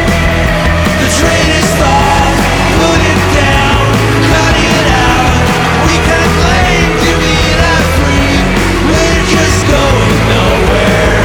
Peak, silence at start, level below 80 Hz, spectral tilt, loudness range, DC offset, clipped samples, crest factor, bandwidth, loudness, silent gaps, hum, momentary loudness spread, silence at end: 0 dBFS; 0 s; -16 dBFS; -4.5 dB/octave; 1 LU; under 0.1%; under 0.1%; 8 dB; over 20 kHz; -8 LUFS; none; none; 2 LU; 0 s